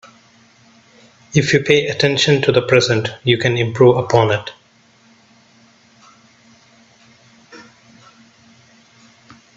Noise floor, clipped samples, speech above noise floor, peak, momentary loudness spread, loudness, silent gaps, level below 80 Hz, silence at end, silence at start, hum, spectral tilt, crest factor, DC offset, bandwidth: -52 dBFS; under 0.1%; 38 dB; 0 dBFS; 5 LU; -15 LUFS; none; -54 dBFS; 1.95 s; 1.35 s; none; -5 dB/octave; 20 dB; under 0.1%; 8 kHz